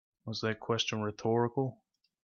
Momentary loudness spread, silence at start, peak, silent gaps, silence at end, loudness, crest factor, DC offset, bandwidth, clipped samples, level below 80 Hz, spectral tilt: 7 LU; 0.25 s; -18 dBFS; none; 0.5 s; -33 LUFS; 16 dB; under 0.1%; 7.2 kHz; under 0.1%; -74 dBFS; -5 dB/octave